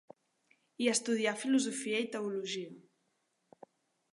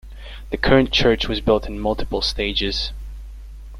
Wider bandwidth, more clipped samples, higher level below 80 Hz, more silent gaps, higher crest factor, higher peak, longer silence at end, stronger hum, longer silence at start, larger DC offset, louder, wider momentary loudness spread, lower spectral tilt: second, 11.5 kHz vs 14 kHz; neither; second, -90 dBFS vs -30 dBFS; neither; about the same, 20 dB vs 20 dB; second, -16 dBFS vs -2 dBFS; first, 1.35 s vs 0 s; neither; first, 0.8 s vs 0.05 s; neither; second, -33 LUFS vs -20 LUFS; second, 9 LU vs 22 LU; second, -3 dB/octave vs -5 dB/octave